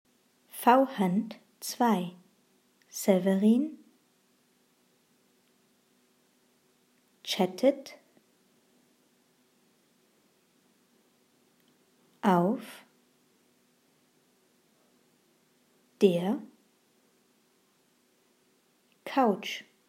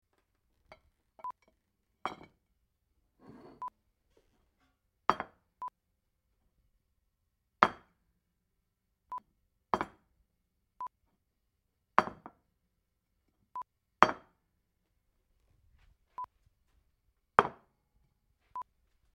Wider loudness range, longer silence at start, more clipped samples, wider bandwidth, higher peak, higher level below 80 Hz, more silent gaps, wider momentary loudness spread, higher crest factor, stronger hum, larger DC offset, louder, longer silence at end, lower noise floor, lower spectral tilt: second, 7 LU vs 15 LU; second, 0.55 s vs 1.25 s; neither; first, 16 kHz vs 13 kHz; second, -8 dBFS vs 0 dBFS; second, under -90 dBFS vs -70 dBFS; neither; second, 19 LU vs 22 LU; second, 26 dB vs 40 dB; neither; neither; first, -28 LUFS vs -32 LUFS; second, 0.25 s vs 0.55 s; second, -69 dBFS vs -81 dBFS; about the same, -6 dB/octave vs -5 dB/octave